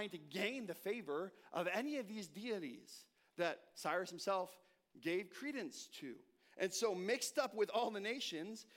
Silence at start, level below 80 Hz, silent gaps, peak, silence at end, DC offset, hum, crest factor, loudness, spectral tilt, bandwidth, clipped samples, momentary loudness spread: 0 s; under -90 dBFS; none; -24 dBFS; 0.15 s; under 0.1%; none; 20 dB; -42 LUFS; -3 dB/octave; 16.5 kHz; under 0.1%; 12 LU